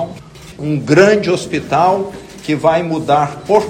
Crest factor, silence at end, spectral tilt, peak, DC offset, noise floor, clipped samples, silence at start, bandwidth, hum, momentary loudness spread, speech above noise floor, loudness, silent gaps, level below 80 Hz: 14 dB; 0 s; -6 dB/octave; 0 dBFS; under 0.1%; -34 dBFS; 0.3%; 0 s; 15.5 kHz; none; 16 LU; 21 dB; -14 LUFS; none; -46 dBFS